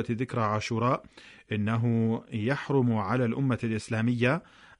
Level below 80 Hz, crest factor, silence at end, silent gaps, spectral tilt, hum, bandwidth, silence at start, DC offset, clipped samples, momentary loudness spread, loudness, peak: -62 dBFS; 14 dB; 0.4 s; none; -7.5 dB/octave; none; 10.5 kHz; 0 s; under 0.1%; under 0.1%; 5 LU; -28 LUFS; -14 dBFS